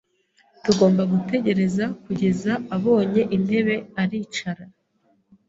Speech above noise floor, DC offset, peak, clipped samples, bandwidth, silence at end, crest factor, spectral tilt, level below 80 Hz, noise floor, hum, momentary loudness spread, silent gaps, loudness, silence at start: 44 dB; under 0.1%; -2 dBFS; under 0.1%; 7.8 kHz; 0.8 s; 20 dB; -6.5 dB/octave; -58 dBFS; -65 dBFS; none; 10 LU; none; -22 LUFS; 0.65 s